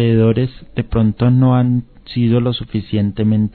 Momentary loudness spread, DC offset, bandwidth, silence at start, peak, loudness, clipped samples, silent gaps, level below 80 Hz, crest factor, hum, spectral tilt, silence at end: 9 LU; under 0.1%; 4.5 kHz; 0 s; -2 dBFS; -16 LUFS; under 0.1%; none; -36 dBFS; 14 dB; none; -12 dB/octave; 0.05 s